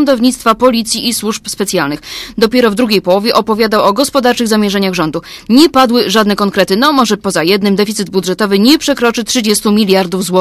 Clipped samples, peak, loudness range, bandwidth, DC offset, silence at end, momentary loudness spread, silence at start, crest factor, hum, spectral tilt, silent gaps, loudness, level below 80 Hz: 0.6%; 0 dBFS; 2 LU; 15.5 kHz; under 0.1%; 0 s; 7 LU; 0 s; 10 dB; none; -4 dB/octave; none; -11 LUFS; -44 dBFS